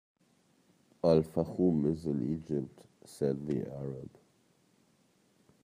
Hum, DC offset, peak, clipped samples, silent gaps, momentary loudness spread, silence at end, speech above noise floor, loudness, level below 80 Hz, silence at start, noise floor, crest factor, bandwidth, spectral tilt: none; under 0.1%; -12 dBFS; under 0.1%; none; 17 LU; 1.55 s; 38 dB; -32 LUFS; -64 dBFS; 1.05 s; -70 dBFS; 22 dB; 15.5 kHz; -8.5 dB/octave